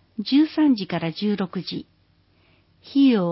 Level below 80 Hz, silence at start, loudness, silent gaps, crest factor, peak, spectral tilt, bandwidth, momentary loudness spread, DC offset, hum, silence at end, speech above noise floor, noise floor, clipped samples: -64 dBFS; 0.2 s; -22 LUFS; none; 14 dB; -8 dBFS; -10.5 dB/octave; 5.8 kHz; 12 LU; under 0.1%; none; 0 s; 40 dB; -61 dBFS; under 0.1%